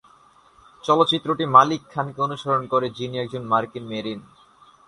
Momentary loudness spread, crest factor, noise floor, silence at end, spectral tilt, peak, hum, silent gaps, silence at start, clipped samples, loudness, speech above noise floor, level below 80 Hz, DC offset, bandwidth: 15 LU; 22 dB; -54 dBFS; 0.65 s; -5.5 dB/octave; 0 dBFS; none; none; 0.85 s; under 0.1%; -21 LUFS; 33 dB; -62 dBFS; under 0.1%; 11 kHz